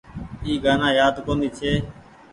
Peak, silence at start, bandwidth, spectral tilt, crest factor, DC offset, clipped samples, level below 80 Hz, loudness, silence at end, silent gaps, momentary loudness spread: -6 dBFS; 0.1 s; 11 kHz; -5.5 dB/octave; 16 dB; under 0.1%; under 0.1%; -40 dBFS; -21 LUFS; 0.35 s; none; 15 LU